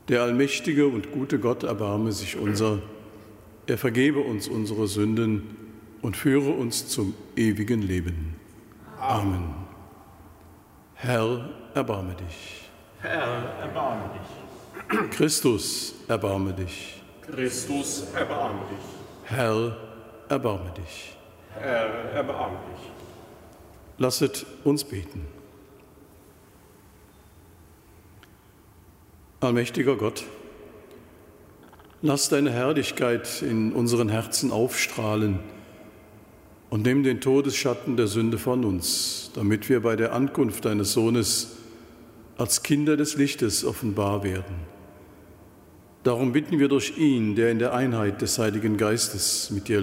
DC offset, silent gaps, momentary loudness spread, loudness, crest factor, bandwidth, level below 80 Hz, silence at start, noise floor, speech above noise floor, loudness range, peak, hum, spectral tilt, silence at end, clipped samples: under 0.1%; none; 18 LU; -25 LUFS; 18 dB; 16 kHz; -52 dBFS; 0.05 s; -54 dBFS; 29 dB; 7 LU; -8 dBFS; none; -4.5 dB/octave; 0 s; under 0.1%